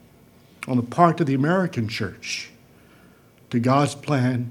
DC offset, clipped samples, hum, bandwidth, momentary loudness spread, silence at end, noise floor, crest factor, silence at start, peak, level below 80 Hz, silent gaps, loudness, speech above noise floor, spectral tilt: under 0.1%; under 0.1%; none; 15.5 kHz; 11 LU; 0 s; -53 dBFS; 22 dB; 0.6 s; 0 dBFS; -64 dBFS; none; -22 LUFS; 31 dB; -6.5 dB/octave